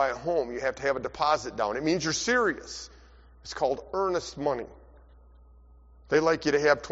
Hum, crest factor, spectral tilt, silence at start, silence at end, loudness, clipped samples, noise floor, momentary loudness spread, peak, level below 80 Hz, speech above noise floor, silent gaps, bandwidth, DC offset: none; 22 dB; -3 dB/octave; 0 s; 0 s; -27 LUFS; under 0.1%; -54 dBFS; 15 LU; -8 dBFS; -54 dBFS; 26 dB; none; 8 kHz; under 0.1%